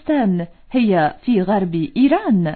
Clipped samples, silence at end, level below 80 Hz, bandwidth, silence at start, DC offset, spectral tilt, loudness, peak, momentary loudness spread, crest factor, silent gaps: under 0.1%; 0 s; -48 dBFS; 4.5 kHz; 0.05 s; under 0.1%; -11.5 dB/octave; -18 LUFS; -4 dBFS; 5 LU; 12 dB; none